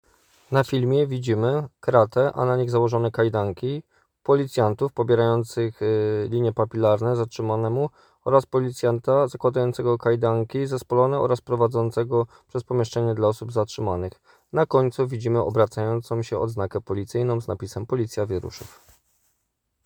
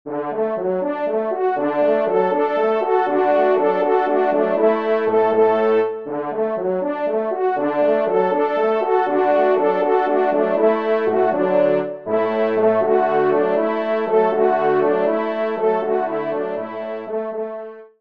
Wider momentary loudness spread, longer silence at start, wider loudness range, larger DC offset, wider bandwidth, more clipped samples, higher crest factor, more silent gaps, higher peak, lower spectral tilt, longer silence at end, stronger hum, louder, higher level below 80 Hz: about the same, 8 LU vs 7 LU; first, 0.5 s vs 0.05 s; about the same, 3 LU vs 2 LU; second, under 0.1% vs 0.3%; first, 19 kHz vs 5.2 kHz; neither; first, 20 dB vs 14 dB; neither; about the same, -2 dBFS vs -4 dBFS; about the same, -7.5 dB/octave vs -8 dB/octave; first, 1.2 s vs 0.15 s; neither; second, -23 LUFS vs -19 LUFS; first, -58 dBFS vs -70 dBFS